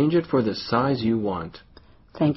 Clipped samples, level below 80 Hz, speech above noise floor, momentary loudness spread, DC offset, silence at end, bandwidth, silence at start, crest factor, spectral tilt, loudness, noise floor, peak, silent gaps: under 0.1%; -52 dBFS; 26 dB; 9 LU; under 0.1%; 0 s; 6 kHz; 0 s; 16 dB; -6 dB/octave; -24 LUFS; -49 dBFS; -6 dBFS; none